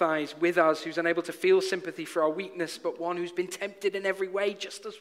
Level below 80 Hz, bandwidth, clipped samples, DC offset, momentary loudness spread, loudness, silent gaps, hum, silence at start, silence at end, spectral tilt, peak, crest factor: -80 dBFS; 15.5 kHz; under 0.1%; under 0.1%; 9 LU; -29 LUFS; none; none; 0 s; 0 s; -4 dB/octave; -10 dBFS; 18 dB